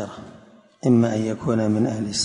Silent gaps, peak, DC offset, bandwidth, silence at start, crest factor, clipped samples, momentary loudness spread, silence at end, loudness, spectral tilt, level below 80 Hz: none; -6 dBFS; under 0.1%; 10.5 kHz; 0 s; 16 dB; under 0.1%; 12 LU; 0 s; -21 LUFS; -5.5 dB/octave; -54 dBFS